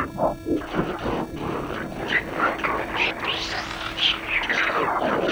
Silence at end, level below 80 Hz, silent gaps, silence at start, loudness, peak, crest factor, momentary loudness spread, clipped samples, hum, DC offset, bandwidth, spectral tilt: 0 s; -44 dBFS; none; 0 s; -24 LUFS; -10 dBFS; 16 dB; 8 LU; under 0.1%; none; under 0.1%; over 20 kHz; -4 dB/octave